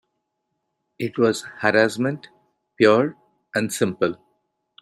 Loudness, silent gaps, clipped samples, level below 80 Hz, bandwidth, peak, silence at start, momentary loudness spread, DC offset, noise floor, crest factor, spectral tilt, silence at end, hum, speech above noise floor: -21 LUFS; none; under 0.1%; -66 dBFS; 15 kHz; -2 dBFS; 1 s; 12 LU; under 0.1%; -77 dBFS; 20 dB; -5 dB/octave; 0.7 s; none; 57 dB